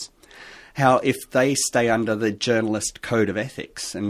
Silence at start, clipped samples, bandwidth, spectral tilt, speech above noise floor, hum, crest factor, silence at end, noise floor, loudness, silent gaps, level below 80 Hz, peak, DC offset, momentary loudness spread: 0 s; under 0.1%; 16 kHz; -4 dB/octave; 24 dB; none; 20 dB; 0 s; -45 dBFS; -22 LUFS; none; -54 dBFS; -2 dBFS; under 0.1%; 15 LU